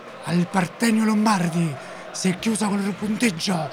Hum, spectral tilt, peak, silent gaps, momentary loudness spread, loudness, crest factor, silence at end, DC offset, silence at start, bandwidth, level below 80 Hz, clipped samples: none; -5 dB/octave; -4 dBFS; none; 6 LU; -22 LUFS; 18 dB; 0 s; under 0.1%; 0 s; 16 kHz; -62 dBFS; under 0.1%